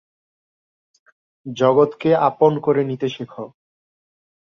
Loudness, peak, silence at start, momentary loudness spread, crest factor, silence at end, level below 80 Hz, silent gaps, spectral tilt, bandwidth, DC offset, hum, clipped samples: -18 LUFS; -2 dBFS; 1.45 s; 19 LU; 20 dB; 0.95 s; -64 dBFS; none; -7.5 dB/octave; 7 kHz; under 0.1%; none; under 0.1%